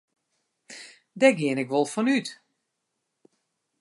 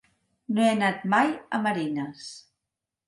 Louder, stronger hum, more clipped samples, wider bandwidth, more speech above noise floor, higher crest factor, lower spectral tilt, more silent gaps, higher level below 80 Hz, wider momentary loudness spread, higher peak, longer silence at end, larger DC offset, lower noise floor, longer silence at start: about the same, -24 LUFS vs -25 LUFS; neither; neither; about the same, 11.5 kHz vs 11.5 kHz; second, 57 dB vs 61 dB; about the same, 22 dB vs 20 dB; about the same, -5 dB/octave vs -5.5 dB/octave; neither; second, -82 dBFS vs -72 dBFS; first, 23 LU vs 14 LU; about the same, -6 dBFS vs -8 dBFS; first, 1.5 s vs 0.7 s; neither; second, -80 dBFS vs -86 dBFS; first, 0.7 s vs 0.5 s